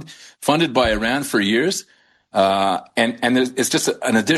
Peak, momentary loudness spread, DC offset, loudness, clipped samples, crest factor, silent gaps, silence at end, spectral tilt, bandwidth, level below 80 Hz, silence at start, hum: -2 dBFS; 4 LU; under 0.1%; -19 LUFS; under 0.1%; 18 dB; none; 0 s; -3.5 dB/octave; 12.5 kHz; -46 dBFS; 0 s; none